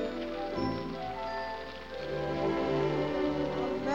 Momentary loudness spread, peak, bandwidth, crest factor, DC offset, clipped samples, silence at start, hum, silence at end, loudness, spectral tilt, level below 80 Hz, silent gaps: 8 LU; -18 dBFS; 8.2 kHz; 16 dB; 0.2%; under 0.1%; 0 s; none; 0 s; -33 LUFS; -7 dB/octave; -52 dBFS; none